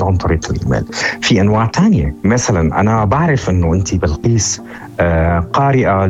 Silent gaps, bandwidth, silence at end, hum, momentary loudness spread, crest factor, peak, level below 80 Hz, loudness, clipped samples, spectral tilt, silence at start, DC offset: none; 10.5 kHz; 0 s; none; 5 LU; 12 dB; -2 dBFS; -28 dBFS; -14 LUFS; under 0.1%; -5.5 dB/octave; 0 s; under 0.1%